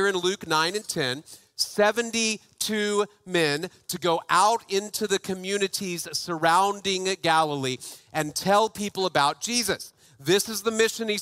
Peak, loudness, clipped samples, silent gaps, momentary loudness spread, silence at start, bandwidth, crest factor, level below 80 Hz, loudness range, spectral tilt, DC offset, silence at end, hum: -6 dBFS; -25 LUFS; under 0.1%; none; 8 LU; 0 s; 16 kHz; 20 dB; -64 dBFS; 1 LU; -3 dB/octave; under 0.1%; 0 s; none